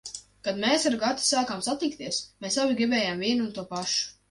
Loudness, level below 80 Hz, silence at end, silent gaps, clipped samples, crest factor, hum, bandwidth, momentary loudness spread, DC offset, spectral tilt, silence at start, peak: -26 LUFS; -64 dBFS; 0.2 s; none; under 0.1%; 16 dB; none; 11.5 kHz; 8 LU; under 0.1%; -2.5 dB/octave; 0.05 s; -12 dBFS